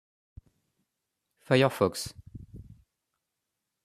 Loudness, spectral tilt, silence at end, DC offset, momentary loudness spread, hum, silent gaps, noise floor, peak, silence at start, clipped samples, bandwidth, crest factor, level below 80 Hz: -27 LUFS; -5.5 dB/octave; 1.25 s; under 0.1%; 24 LU; none; none; -85 dBFS; -8 dBFS; 1.5 s; under 0.1%; 14 kHz; 24 dB; -60 dBFS